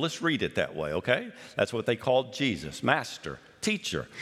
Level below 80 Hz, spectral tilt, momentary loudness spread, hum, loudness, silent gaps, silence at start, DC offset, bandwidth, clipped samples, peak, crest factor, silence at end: -60 dBFS; -4.5 dB/octave; 8 LU; none; -29 LUFS; none; 0 s; under 0.1%; 15 kHz; under 0.1%; -6 dBFS; 24 dB; 0 s